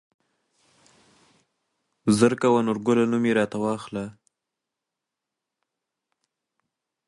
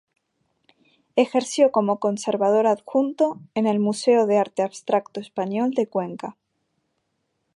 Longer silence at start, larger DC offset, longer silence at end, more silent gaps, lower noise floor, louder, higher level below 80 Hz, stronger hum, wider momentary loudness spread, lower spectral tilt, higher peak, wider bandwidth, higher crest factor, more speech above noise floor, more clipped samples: first, 2.05 s vs 1.15 s; neither; first, 2.95 s vs 1.25 s; neither; first, -86 dBFS vs -74 dBFS; about the same, -23 LUFS vs -22 LUFS; first, -66 dBFS vs -76 dBFS; neither; first, 13 LU vs 9 LU; about the same, -6 dB/octave vs -5.5 dB/octave; about the same, -4 dBFS vs -4 dBFS; about the same, 11.5 kHz vs 11.5 kHz; first, 24 dB vs 18 dB; first, 64 dB vs 53 dB; neither